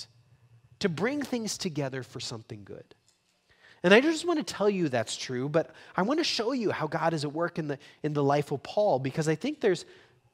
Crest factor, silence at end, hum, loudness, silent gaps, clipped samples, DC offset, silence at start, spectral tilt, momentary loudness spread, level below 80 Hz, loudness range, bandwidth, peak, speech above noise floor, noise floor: 26 dB; 0.5 s; none; -29 LUFS; none; under 0.1%; under 0.1%; 0 s; -5 dB/octave; 11 LU; -70 dBFS; 8 LU; 16 kHz; -4 dBFS; 41 dB; -69 dBFS